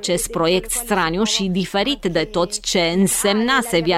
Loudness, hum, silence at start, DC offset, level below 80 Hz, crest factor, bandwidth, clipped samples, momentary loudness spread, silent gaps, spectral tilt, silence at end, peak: -18 LUFS; none; 0 s; under 0.1%; -40 dBFS; 14 dB; 16.5 kHz; under 0.1%; 4 LU; none; -3.5 dB/octave; 0 s; -4 dBFS